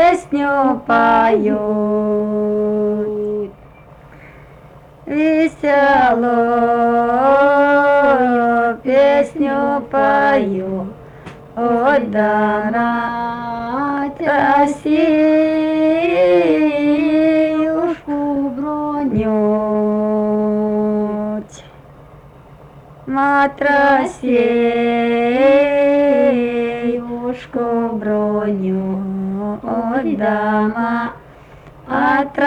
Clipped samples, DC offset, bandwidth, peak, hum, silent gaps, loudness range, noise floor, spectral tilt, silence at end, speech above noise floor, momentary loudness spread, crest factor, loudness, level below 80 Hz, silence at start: under 0.1%; under 0.1%; 10 kHz; -4 dBFS; none; none; 7 LU; -41 dBFS; -7 dB/octave; 0 s; 27 dB; 10 LU; 12 dB; -16 LUFS; -48 dBFS; 0 s